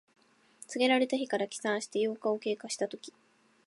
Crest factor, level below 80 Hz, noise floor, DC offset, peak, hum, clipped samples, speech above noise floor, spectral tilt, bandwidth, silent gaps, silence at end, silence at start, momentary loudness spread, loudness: 20 dB; -86 dBFS; -57 dBFS; under 0.1%; -14 dBFS; none; under 0.1%; 26 dB; -3 dB/octave; 11.5 kHz; none; 0.55 s; 0.7 s; 16 LU; -32 LUFS